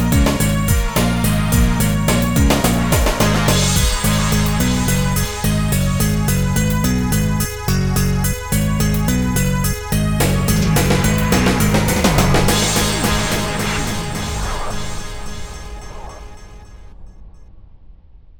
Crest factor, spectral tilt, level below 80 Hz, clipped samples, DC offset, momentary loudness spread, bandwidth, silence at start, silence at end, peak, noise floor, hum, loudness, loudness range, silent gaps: 16 dB; -4.5 dB/octave; -24 dBFS; under 0.1%; 1%; 10 LU; 19.5 kHz; 0 s; 0.05 s; 0 dBFS; -41 dBFS; none; -17 LUFS; 11 LU; none